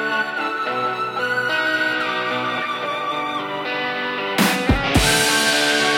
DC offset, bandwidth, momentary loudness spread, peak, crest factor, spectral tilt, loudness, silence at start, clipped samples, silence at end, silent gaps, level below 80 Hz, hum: under 0.1%; 16.5 kHz; 8 LU; -2 dBFS; 18 dB; -3 dB/octave; -19 LUFS; 0 s; under 0.1%; 0 s; none; -36 dBFS; none